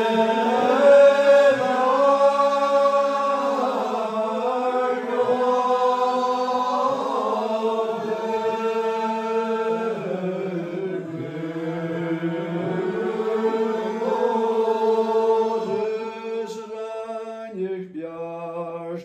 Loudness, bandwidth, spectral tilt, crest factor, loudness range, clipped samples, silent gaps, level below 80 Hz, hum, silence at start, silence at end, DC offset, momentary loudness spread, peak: -22 LUFS; 12 kHz; -6 dB/octave; 16 dB; 10 LU; under 0.1%; none; -74 dBFS; none; 0 s; 0 s; under 0.1%; 14 LU; -4 dBFS